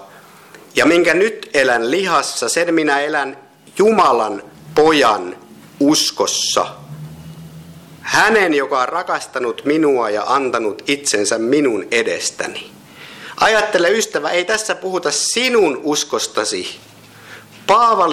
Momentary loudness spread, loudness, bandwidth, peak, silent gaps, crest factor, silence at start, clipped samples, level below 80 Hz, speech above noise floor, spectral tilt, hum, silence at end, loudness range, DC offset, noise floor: 18 LU; -16 LUFS; 15.5 kHz; -4 dBFS; none; 14 dB; 0 s; under 0.1%; -56 dBFS; 26 dB; -2.5 dB/octave; none; 0 s; 2 LU; under 0.1%; -42 dBFS